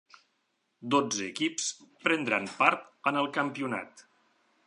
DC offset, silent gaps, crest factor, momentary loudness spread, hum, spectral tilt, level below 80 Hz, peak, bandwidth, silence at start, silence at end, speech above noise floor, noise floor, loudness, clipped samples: under 0.1%; none; 24 dB; 9 LU; none; -3 dB/octave; -80 dBFS; -8 dBFS; 11.5 kHz; 0.8 s; 0.65 s; 47 dB; -77 dBFS; -29 LUFS; under 0.1%